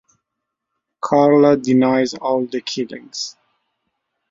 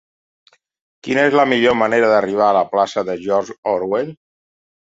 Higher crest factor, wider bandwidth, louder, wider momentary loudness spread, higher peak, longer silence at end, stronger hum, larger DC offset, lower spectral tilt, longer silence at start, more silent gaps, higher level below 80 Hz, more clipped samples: about the same, 18 dB vs 16 dB; about the same, 7.8 kHz vs 8 kHz; about the same, -17 LUFS vs -16 LUFS; first, 15 LU vs 8 LU; about the same, -2 dBFS vs -2 dBFS; first, 1 s vs 0.75 s; neither; neither; about the same, -5.5 dB/octave vs -5 dB/octave; about the same, 1.05 s vs 1.05 s; second, none vs 3.58-3.63 s; about the same, -62 dBFS vs -60 dBFS; neither